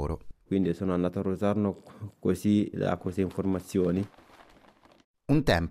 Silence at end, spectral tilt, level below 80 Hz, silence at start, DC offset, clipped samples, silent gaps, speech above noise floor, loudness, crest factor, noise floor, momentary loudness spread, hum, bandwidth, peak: 0 s; -7.5 dB/octave; -48 dBFS; 0 s; under 0.1%; under 0.1%; 5.04-5.14 s; 31 dB; -29 LUFS; 18 dB; -58 dBFS; 12 LU; none; 14.5 kHz; -10 dBFS